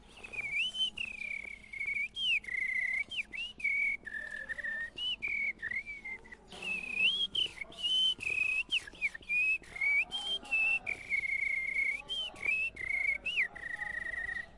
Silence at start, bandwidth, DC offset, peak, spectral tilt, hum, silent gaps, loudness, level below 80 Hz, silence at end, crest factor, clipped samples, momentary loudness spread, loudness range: 0.1 s; 11.5 kHz; under 0.1%; -20 dBFS; -0.5 dB/octave; none; none; -32 LUFS; -62 dBFS; 0 s; 14 dB; under 0.1%; 10 LU; 4 LU